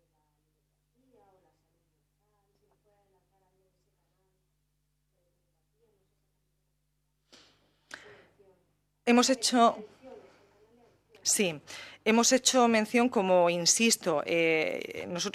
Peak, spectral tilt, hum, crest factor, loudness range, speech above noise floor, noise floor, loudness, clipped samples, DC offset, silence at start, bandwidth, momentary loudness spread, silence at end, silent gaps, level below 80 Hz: -10 dBFS; -2.5 dB/octave; 50 Hz at -75 dBFS; 22 dB; 5 LU; 51 dB; -77 dBFS; -26 LUFS; under 0.1%; under 0.1%; 9.05 s; 15 kHz; 12 LU; 0.05 s; none; -76 dBFS